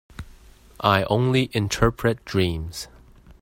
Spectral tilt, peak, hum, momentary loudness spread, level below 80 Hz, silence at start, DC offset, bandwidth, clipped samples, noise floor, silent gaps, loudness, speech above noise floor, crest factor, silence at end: -5.5 dB/octave; -2 dBFS; none; 18 LU; -40 dBFS; 0.2 s; under 0.1%; 16.5 kHz; under 0.1%; -49 dBFS; none; -22 LUFS; 27 dB; 22 dB; 0.55 s